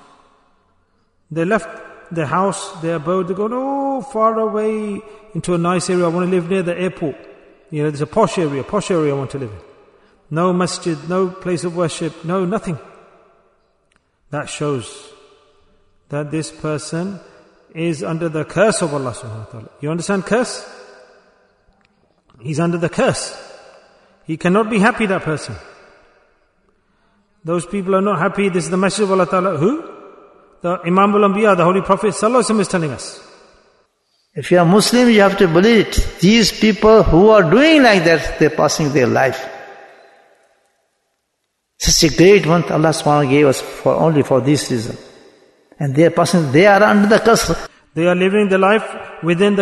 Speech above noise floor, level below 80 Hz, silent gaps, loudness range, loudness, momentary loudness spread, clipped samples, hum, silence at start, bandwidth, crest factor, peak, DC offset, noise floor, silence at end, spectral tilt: 56 dB; -36 dBFS; none; 12 LU; -15 LUFS; 17 LU; under 0.1%; none; 1.3 s; 12.5 kHz; 16 dB; 0 dBFS; under 0.1%; -71 dBFS; 0 s; -5 dB/octave